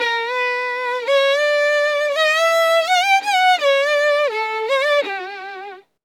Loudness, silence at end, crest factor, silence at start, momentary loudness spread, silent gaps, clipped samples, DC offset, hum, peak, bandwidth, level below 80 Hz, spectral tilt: -17 LUFS; 0.25 s; 12 dB; 0 s; 11 LU; none; under 0.1%; under 0.1%; none; -6 dBFS; 17.5 kHz; -90 dBFS; 1.5 dB/octave